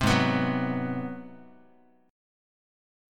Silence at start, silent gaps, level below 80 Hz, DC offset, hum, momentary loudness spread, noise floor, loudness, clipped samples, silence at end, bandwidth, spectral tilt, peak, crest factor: 0 s; none; -52 dBFS; under 0.1%; none; 18 LU; -61 dBFS; -28 LUFS; under 0.1%; 0.95 s; 16.5 kHz; -5.5 dB/octave; -10 dBFS; 20 dB